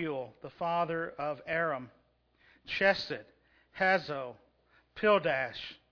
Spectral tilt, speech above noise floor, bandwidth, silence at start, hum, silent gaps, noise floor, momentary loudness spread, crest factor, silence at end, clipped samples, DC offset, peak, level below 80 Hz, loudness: -5.5 dB/octave; 36 dB; 5.4 kHz; 0 s; none; none; -68 dBFS; 16 LU; 20 dB; 0.15 s; under 0.1%; under 0.1%; -12 dBFS; -68 dBFS; -32 LUFS